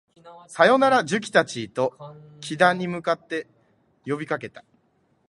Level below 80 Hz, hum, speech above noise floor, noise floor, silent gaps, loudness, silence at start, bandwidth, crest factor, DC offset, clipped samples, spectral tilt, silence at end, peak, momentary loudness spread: -70 dBFS; none; 43 dB; -66 dBFS; none; -22 LUFS; 0.25 s; 11.5 kHz; 22 dB; under 0.1%; under 0.1%; -4.5 dB/octave; 0.7 s; -2 dBFS; 21 LU